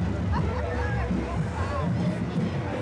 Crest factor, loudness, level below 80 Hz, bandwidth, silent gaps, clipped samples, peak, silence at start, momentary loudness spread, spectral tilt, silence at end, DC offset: 12 dB; -28 LUFS; -36 dBFS; 10.5 kHz; none; under 0.1%; -16 dBFS; 0 s; 2 LU; -8 dB/octave; 0 s; under 0.1%